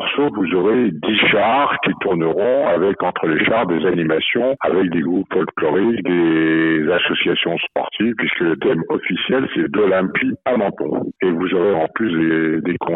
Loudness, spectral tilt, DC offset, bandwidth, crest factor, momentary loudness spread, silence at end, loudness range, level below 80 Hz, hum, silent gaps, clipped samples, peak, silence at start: -17 LUFS; -10 dB/octave; under 0.1%; 4.1 kHz; 12 dB; 4 LU; 0 s; 2 LU; -58 dBFS; none; none; under 0.1%; -6 dBFS; 0 s